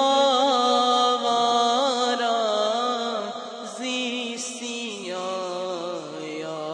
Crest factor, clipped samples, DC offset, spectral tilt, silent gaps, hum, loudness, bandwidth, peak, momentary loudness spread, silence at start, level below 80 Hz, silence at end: 16 dB; under 0.1%; under 0.1%; -2 dB/octave; none; none; -24 LUFS; 10.5 kHz; -8 dBFS; 13 LU; 0 s; -82 dBFS; 0 s